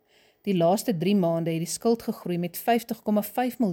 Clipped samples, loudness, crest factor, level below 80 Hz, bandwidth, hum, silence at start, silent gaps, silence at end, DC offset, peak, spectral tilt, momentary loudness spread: under 0.1%; -26 LUFS; 14 dB; -68 dBFS; 17 kHz; none; 0.45 s; none; 0 s; under 0.1%; -12 dBFS; -6 dB/octave; 7 LU